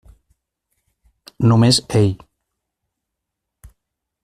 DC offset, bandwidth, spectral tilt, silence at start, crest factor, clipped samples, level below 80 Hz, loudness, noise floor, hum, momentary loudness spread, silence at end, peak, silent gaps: under 0.1%; 13.5 kHz; -5.5 dB/octave; 1.4 s; 18 dB; under 0.1%; -48 dBFS; -16 LUFS; -80 dBFS; none; 7 LU; 2.1 s; -2 dBFS; none